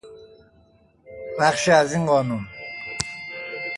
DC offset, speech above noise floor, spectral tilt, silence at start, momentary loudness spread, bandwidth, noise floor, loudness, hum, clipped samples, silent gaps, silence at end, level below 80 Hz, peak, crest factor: under 0.1%; 38 dB; -4.5 dB/octave; 0.05 s; 16 LU; 11.5 kHz; -57 dBFS; -22 LUFS; none; under 0.1%; none; 0 s; -56 dBFS; -2 dBFS; 22 dB